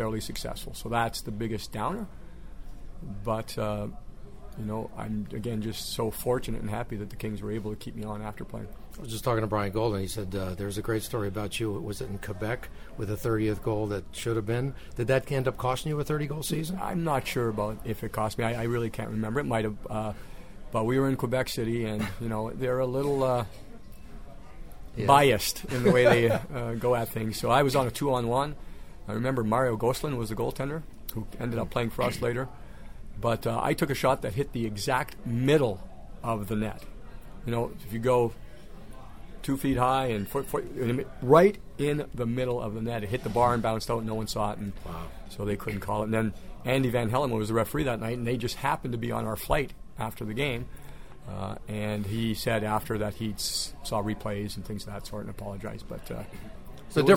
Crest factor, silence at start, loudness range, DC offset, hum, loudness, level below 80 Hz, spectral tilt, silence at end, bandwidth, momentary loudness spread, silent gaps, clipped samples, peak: 24 dB; 0 s; 8 LU; 0.6%; none; -29 LUFS; -44 dBFS; -5.5 dB/octave; 0 s; 16.5 kHz; 17 LU; none; under 0.1%; -4 dBFS